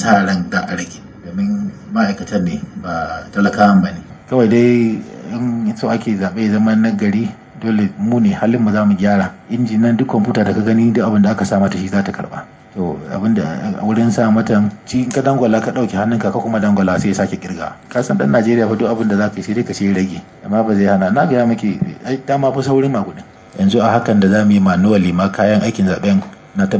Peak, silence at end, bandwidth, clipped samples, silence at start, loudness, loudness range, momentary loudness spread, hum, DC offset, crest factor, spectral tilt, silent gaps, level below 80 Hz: 0 dBFS; 0 s; 8 kHz; under 0.1%; 0 s; -15 LUFS; 3 LU; 10 LU; none; under 0.1%; 14 dB; -7 dB/octave; none; -44 dBFS